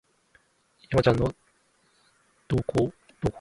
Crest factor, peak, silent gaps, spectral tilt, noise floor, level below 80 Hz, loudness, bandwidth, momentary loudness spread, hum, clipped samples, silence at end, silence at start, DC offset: 24 dB; -6 dBFS; none; -7.5 dB/octave; -66 dBFS; -46 dBFS; -27 LUFS; 11.5 kHz; 9 LU; none; under 0.1%; 0 s; 0.9 s; under 0.1%